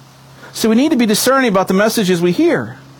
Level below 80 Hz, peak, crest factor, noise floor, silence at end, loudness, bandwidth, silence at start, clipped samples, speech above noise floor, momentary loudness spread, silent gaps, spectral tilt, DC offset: -54 dBFS; -2 dBFS; 12 dB; -39 dBFS; 0.2 s; -13 LUFS; over 20 kHz; 0.4 s; under 0.1%; 26 dB; 6 LU; none; -4.5 dB/octave; under 0.1%